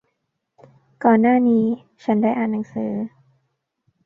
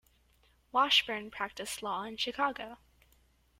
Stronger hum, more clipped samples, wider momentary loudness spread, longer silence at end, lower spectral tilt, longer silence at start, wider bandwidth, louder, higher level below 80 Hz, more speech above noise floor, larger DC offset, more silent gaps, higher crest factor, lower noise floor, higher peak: neither; neither; about the same, 12 LU vs 13 LU; about the same, 0.95 s vs 0.85 s; first, -9.5 dB/octave vs -1.5 dB/octave; first, 1 s vs 0.75 s; second, 4 kHz vs 16.5 kHz; first, -20 LUFS vs -31 LUFS; about the same, -66 dBFS vs -66 dBFS; first, 57 dB vs 35 dB; neither; neither; about the same, 20 dB vs 22 dB; first, -75 dBFS vs -68 dBFS; first, -2 dBFS vs -14 dBFS